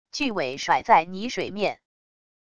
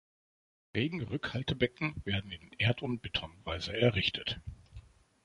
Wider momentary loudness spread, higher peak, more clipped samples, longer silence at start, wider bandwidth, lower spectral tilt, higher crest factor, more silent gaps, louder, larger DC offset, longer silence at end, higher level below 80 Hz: about the same, 11 LU vs 11 LU; first, -4 dBFS vs -12 dBFS; neither; second, 0.05 s vs 0.75 s; about the same, 10 kHz vs 11 kHz; second, -4 dB/octave vs -6 dB/octave; about the same, 22 dB vs 24 dB; neither; first, -24 LUFS vs -34 LUFS; first, 0.4% vs under 0.1%; first, 0.65 s vs 0.45 s; second, -60 dBFS vs -52 dBFS